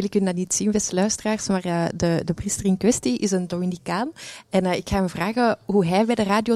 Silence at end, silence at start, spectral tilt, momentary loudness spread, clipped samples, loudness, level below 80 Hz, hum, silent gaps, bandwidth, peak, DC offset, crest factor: 0 s; 0 s; -5 dB/octave; 6 LU; under 0.1%; -23 LUFS; -46 dBFS; none; none; 14 kHz; -6 dBFS; under 0.1%; 16 dB